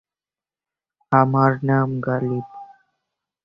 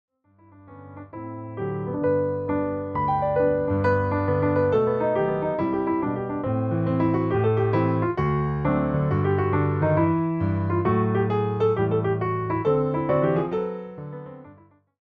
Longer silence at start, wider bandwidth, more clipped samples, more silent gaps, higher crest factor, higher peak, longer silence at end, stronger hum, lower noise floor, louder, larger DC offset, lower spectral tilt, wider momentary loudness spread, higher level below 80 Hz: first, 1.1 s vs 0.65 s; about the same, 5.2 kHz vs 4.9 kHz; neither; neither; first, 20 dB vs 14 dB; first, -2 dBFS vs -10 dBFS; first, 0.8 s vs 0.5 s; neither; first, under -90 dBFS vs -55 dBFS; first, -20 LUFS vs -24 LUFS; neither; about the same, -11 dB/octave vs -11 dB/octave; about the same, 10 LU vs 10 LU; second, -58 dBFS vs -50 dBFS